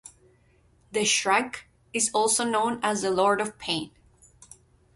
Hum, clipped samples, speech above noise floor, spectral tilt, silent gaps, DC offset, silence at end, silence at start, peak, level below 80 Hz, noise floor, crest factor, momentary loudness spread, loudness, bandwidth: none; under 0.1%; 36 dB; -2 dB/octave; none; under 0.1%; 1.05 s; 0.05 s; -8 dBFS; -64 dBFS; -62 dBFS; 20 dB; 11 LU; -25 LUFS; 12 kHz